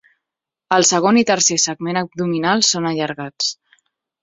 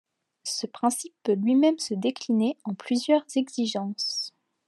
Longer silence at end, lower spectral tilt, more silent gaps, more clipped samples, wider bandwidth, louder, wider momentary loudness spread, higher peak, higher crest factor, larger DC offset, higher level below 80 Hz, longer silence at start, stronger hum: first, 0.7 s vs 0.4 s; second, -2.5 dB/octave vs -4.5 dB/octave; neither; neither; second, 8 kHz vs 12.5 kHz; first, -17 LUFS vs -26 LUFS; about the same, 9 LU vs 10 LU; first, 0 dBFS vs -10 dBFS; about the same, 18 dB vs 16 dB; neither; first, -62 dBFS vs -86 dBFS; first, 0.7 s vs 0.45 s; neither